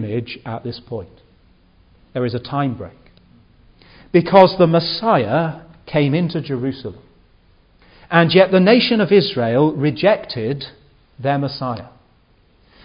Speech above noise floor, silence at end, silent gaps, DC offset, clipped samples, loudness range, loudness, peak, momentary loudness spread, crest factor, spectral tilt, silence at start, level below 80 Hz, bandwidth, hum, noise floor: 38 dB; 0.95 s; none; under 0.1%; under 0.1%; 11 LU; -17 LUFS; 0 dBFS; 18 LU; 18 dB; -9.5 dB/octave; 0 s; -52 dBFS; 5.4 kHz; none; -55 dBFS